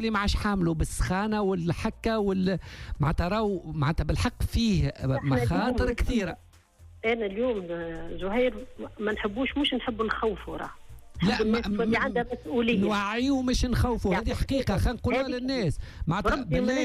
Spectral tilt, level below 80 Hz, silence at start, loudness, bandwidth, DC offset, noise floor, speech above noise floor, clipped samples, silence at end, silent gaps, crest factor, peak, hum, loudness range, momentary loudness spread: -6 dB/octave; -36 dBFS; 0 s; -28 LUFS; 14.5 kHz; under 0.1%; -53 dBFS; 26 dB; under 0.1%; 0 s; none; 14 dB; -14 dBFS; none; 3 LU; 8 LU